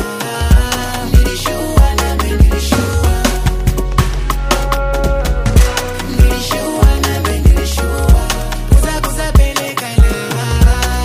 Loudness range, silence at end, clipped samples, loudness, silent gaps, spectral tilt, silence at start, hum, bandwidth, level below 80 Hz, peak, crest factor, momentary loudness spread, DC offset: 1 LU; 0 s; under 0.1%; -14 LUFS; none; -5 dB/octave; 0 s; none; 16 kHz; -14 dBFS; 0 dBFS; 12 dB; 5 LU; under 0.1%